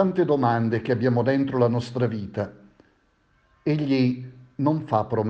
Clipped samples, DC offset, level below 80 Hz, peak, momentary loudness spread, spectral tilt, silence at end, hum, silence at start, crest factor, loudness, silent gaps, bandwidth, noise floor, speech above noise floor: under 0.1%; under 0.1%; -60 dBFS; -6 dBFS; 10 LU; -9 dB/octave; 0 s; none; 0 s; 18 dB; -24 LUFS; none; 8 kHz; -64 dBFS; 42 dB